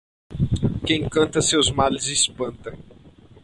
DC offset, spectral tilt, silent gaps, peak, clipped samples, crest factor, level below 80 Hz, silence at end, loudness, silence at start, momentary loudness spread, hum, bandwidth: under 0.1%; -3.5 dB/octave; none; -6 dBFS; under 0.1%; 18 dB; -40 dBFS; 0.35 s; -21 LUFS; 0.3 s; 15 LU; none; 11.5 kHz